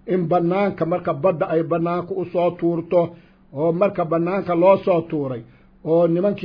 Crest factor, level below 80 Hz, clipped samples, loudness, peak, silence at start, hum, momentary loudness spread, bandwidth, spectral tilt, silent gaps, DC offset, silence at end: 16 dB; -56 dBFS; under 0.1%; -20 LUFS; -4 dBFS; 0.05 s; none; 9 LU; 5.4 kHz; -10.5 dB/octave; none; under 0.1%; 0 s